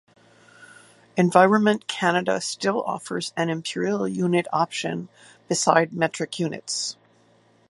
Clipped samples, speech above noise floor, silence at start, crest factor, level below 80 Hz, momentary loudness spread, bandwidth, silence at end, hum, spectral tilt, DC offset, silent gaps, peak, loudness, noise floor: under 0.1%; 36 dB; 0.6 s; 24 dB; -70 dBFS; 11 LU; 11.5 kHz; 0.75 s; none; -4.5 dB/octave; under 0.1%; none; 0 dBFS; -23 LUFS; -59 dBFS